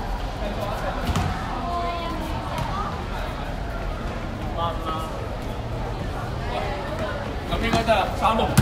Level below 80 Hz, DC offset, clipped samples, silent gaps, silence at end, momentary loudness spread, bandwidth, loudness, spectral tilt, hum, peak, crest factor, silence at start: -32 dBFS; under 0.1%; under 0.1%; none; 0 s; 9 LU; 16 kHz; -27 LUFS; -5.5 dB/octave; none; -2 dBFS; 22 dB; 0 s